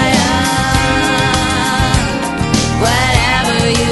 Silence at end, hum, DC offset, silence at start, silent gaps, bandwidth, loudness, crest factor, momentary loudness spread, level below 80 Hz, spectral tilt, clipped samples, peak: 0 s; none; under 0.1%; 0 s; none; 12 kHz; -13 LUFS; 12 dB; 3 LU; -24 dBFS; -4 dB/octave; under 0.1%; 0 dBFS